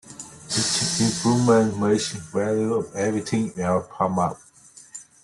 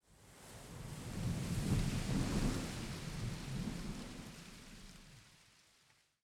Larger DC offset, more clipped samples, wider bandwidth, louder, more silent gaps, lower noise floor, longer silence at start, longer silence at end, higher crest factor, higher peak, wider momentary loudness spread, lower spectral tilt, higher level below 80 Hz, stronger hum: neither; neither; second, 12.5 kHz vs 17 kHz; first, -22 LUFS vs -41 LUFS; neither; second, -48 dBFS vs -72 dBFS; about the same, 0.05 s vs 0.1 s; second, 0.2 s vs 0.9 s; about the same, 18 dB vs 18 dB; first, -6 dBFS vs -24 dBFS; about the same, 20 LU vs 21 LU; about the same, -4.5 dB/octave vs -5.5 dB/octave; second, -58 dBFS vs -48 dBFS; neither